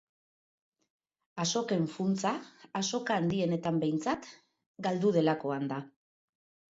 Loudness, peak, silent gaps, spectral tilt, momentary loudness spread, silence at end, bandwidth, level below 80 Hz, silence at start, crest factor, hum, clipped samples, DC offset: -32 LUFS; -16 dBFS; 4.66-4.74 s; -5 dB/octave; 11 LU; 0.85 s; 8 kHz; -72 dBFS; 1.35 s; 18 dB; none; under 0.1%; under 0.1%